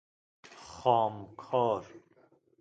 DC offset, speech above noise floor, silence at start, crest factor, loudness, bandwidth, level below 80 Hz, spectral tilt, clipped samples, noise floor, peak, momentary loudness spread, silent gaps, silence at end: under 0.1%; 36 dB; 0.5 s; 22 dB; -30 LUFS; 9 kHz; -70 dBFS; -6.5 dB/octave; under 0.1%; -65 dBFS; -12 dBFS; 20 LU; none; 0.65 s